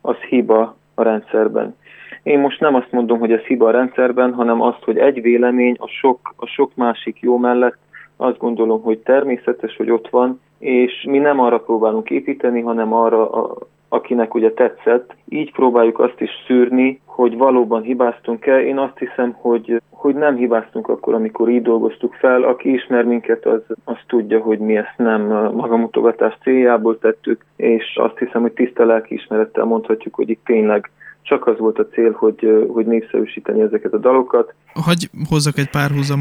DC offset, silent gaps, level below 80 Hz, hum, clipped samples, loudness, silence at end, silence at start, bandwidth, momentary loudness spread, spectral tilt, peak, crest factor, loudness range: under 0.1%; none; -58 dBFS; none; under 0.1%; -16 LUFS; 0 s; 0.05 s; 14.5 kHz; 7 LU; -6.5 dB/octave; -2 dBFS; 14 dB; 2 LU